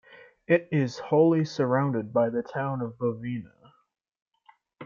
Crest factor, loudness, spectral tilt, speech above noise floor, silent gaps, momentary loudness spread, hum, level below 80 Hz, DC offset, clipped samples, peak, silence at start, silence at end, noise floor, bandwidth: 20 dB; -26 LUFS; -8 dB/octave; 36 dB; 4.22-4.26 s; 9 LU; none; -70 dBFS; under 0.1%; under 0.1%; -8 dBFS; 0.1 s; 0 s; -62 dBFS; 7.2 kHz